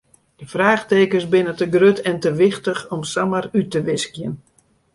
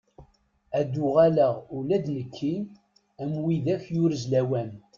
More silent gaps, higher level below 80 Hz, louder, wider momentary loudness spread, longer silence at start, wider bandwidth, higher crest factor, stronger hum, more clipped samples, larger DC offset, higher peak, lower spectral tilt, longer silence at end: neither; about the same, -58 dBFS vs -62 dBFS; first, -18 LUFS vs -26 LUFS; about the same, 11 LU vs 12 LU; first, 0.4 s vs 0.2 s; first, 11.5 kHz vs 7.4 kHz; about the same, 16 dB vs 18 dB; neither; neither; neither; first, -2 dBFS vs -8 dBFS; second, -5.5 dB/octave vs -8 dB/octave; first, 0.6 s vs 0.2 s